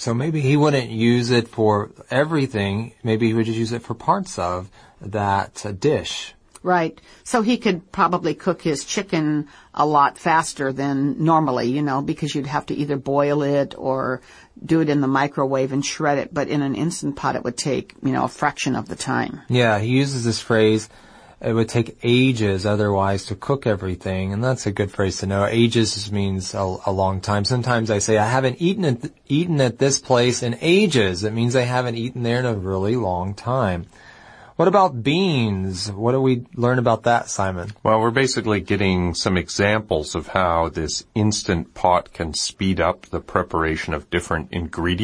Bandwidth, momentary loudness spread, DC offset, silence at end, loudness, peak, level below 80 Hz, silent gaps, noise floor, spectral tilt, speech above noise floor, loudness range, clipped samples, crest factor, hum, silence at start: 10.5 kHz; 7 LU; under 0.1%; 0 s; -21 LUFS; 0 dBFS; -46 dBFS; none; -45 dBFS; -5.5 dB/octave; 25 dB; 3 LU; under 0.1%; 20 dB; none; 0 s